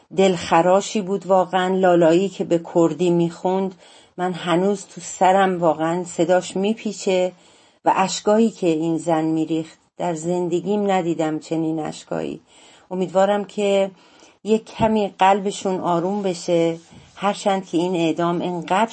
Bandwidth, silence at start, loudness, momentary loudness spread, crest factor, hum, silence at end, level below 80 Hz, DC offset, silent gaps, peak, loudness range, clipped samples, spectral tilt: 8.8 kHz; 0.1 s; -20 LUFS; 10 LU; 18 dB; none; 0 s; -60 dBFS; under 0.1%; none; -2 dBFS; 4 LU; under 0.1%; -5.5 dB/octave